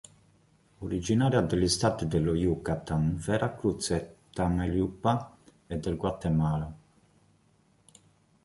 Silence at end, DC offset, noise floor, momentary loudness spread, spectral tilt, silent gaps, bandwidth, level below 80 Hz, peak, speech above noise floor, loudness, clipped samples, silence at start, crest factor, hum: 1.65 s; under 0.1%; -66 dBFS; 10 LU; -6 dB/octave; none; 11.5 kHz; -46 dBFS; -10 dBFS; 38 dB; -29 LUFS; under 0.1%; 0.8 s; 20 dB; none